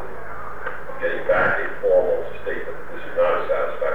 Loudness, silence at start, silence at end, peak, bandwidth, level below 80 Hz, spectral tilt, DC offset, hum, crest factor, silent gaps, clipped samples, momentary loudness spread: -23 LUFS; 0 s; 0 s; -8 dBFS; 5 kHz; -46 dBFS; -6.5 dB/octave; 6%; none; 14 dB; none; under 0.1%; 15 LU